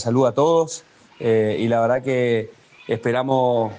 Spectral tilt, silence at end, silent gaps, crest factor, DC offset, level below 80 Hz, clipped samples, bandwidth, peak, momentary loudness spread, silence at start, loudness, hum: -6 dB/octave; 0 s; none; 14 dB; under 0.1%; -64 dBFS; under 0.1%; 9.6 kHz; -6 dBFS; 10 LU; 0 s; -20 LUFS; none